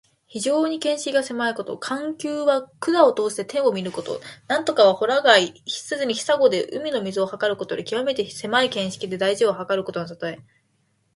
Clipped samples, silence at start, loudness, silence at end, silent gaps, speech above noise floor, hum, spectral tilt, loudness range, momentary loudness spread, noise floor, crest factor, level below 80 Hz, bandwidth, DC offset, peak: under 0.1%; 0.35 s; -22 LUFS; 0.75 s; none; 45 dB; none; -3.5 dB/octave; 4 LU; 12 LU; -67 dBFS; 22 dB; -68 dBFS; 11.5 kHz; under 0.1%; 0 dBFS